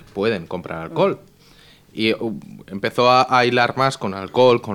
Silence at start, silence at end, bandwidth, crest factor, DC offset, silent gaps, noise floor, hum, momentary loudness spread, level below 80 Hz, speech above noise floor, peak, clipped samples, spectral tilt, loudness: 0.15 s; 0 s; 15.5 kHz; 18 dB; under 0.1%; none; -49 dBFS; none; 15 LU; -58 dBFS; 31 dB; -2 dBFS; under 0.1%; -5.5 dB/octave; -19 LUFS